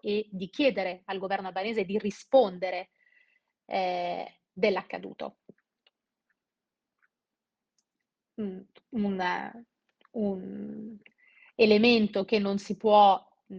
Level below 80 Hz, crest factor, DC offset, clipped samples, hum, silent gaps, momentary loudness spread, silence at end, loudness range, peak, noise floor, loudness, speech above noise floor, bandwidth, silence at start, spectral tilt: -70 dBFS; 20 dB; under 0.1%; under 0.1%; none; none; 20 LU; 0 s; 17 LU; -10 dBFS; -89 dBFS; -27 LUFS; 62 dB; 7.8 kHz; 0.05 s; -6 dB/octave